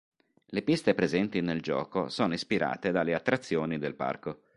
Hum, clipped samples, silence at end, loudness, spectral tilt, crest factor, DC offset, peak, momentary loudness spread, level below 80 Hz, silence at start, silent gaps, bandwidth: none; under 0.1%; 0.2 s; -30 LUFS; -6 dB/octave; 22 dB; under 0.1%; -8 dBFS; 6 LU; -62 dBFS; 0.5 s; none; 11.5 kHz